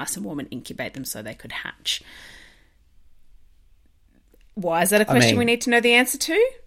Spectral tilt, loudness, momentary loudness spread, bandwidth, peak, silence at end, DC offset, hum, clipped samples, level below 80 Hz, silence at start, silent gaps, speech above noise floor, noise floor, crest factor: -3.5 dB/octave; -21 LUFS; 17 LU; 16.5 kHz; -2 dBFS; 0.1 s; under 0.1%; none; under 0.1%; -54 dBFS; 0 s; none; 35 dB; -57 dBFS; 22 dB